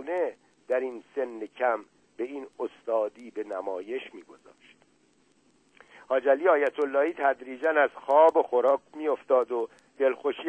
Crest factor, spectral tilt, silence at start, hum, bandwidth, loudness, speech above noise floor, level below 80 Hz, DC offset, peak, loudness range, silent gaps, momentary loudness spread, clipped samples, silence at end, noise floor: 20 dB; -4.5 dB/octave; 0 s; none; 8.6 kHz; -27 LUFS; 39 dB; -80 dBFS; under 0.1%; -8 dBFS; 11 LU; none; 14 LU; under 0.1%; 0 s; -66 dBFS